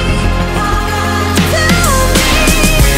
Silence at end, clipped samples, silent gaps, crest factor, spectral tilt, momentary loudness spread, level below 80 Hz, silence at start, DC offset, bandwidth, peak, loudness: 0 s; under 0.1%; none; 10 dB; -4 dB/octave; 5 LU; -16 dBFS; 0 s; under 0.1%; 16.5 kHz; 0 dBFS; -11 LUFS